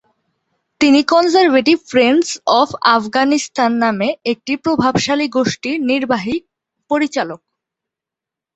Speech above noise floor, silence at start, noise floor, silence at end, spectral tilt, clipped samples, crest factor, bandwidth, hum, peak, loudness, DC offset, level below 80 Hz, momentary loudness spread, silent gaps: 71 dB; 0.8 s; -86 dBFS; 1.2 s; -4 dB/octave; under 0.1%; 16 dB; 8.2 kHz; none; 0 dBFS; -15 LUFS; under 0.1%; -54 dBFS; 9 LU; none